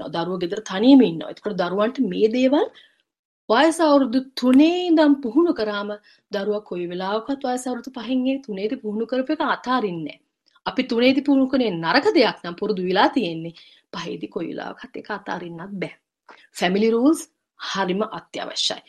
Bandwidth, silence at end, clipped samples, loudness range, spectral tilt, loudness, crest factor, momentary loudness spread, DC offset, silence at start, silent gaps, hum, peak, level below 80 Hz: 12.5 kHz; 0.1 s; under 0.1%; 7 LU; -5 dB/octave; -21 LUFS; 20 dB; 15 LU; under 0.1%; 0 s; 3.19-3.48 s; none; -2 dBFS; -64 dBFS